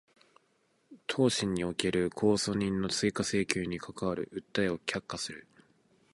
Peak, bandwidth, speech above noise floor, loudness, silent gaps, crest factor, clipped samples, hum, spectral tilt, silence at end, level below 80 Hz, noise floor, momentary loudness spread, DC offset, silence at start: -8 dBFS; 11.5 kHz; 41 dB; -32 LUFS; none; 26 dB; under 0.1%; none; -4.5 dB/octave; 0.75 s; -58 dBFS; -72 dBFS; 10 LU; under 0.1%; 0.9 s